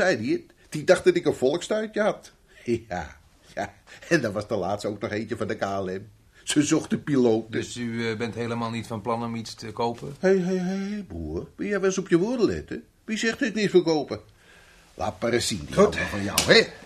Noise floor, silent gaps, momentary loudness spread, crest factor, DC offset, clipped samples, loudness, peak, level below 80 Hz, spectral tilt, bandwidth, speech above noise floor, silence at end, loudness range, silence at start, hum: -53 dBFS; none; 13 LU; 24 dB; under 0.1%; under 0.1%; -25 LUFS; -2 dBFS; -52 dBFS; -4.5 dB/octave; 15 kHz; 28 dB; 0 s; 4 LU; 0 s; none